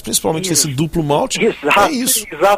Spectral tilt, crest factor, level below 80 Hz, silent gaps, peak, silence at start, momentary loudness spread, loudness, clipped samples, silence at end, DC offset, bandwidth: -3 dB/octave; 14 dB; -42 dBFS; none; 0 dBFS; 0 s; 4 LU; -15 LUFS; under 0.1%; 0 s; under 0.1%; 16 kHz